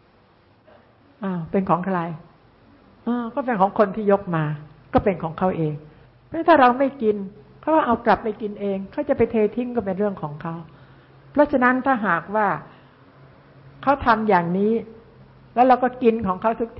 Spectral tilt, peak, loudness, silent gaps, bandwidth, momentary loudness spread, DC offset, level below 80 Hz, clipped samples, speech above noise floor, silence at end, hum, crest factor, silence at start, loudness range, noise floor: -11.5 dB/octave; -4 dBFS; -21 LUFS; none; 5.8 kHz; 13 LU; under 0.1%; -50 dBFS; under 0.1%; 35 dB; 0 s; none; 20 dB; 1.2 s; 4 LU; -56 dBFS